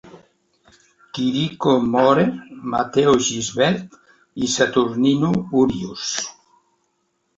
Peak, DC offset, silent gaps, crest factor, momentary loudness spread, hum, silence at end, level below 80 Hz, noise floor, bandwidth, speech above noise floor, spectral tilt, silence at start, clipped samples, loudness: -2 dBFS; under 0.1%; none; 18 dB; 10 LU; none; 1.05 s; -52 dBFS; -69 dBFS; 8 kHz; 51 dB; -4.5 dB/octave; 0.05 s; under 0.1%; -19 LUFS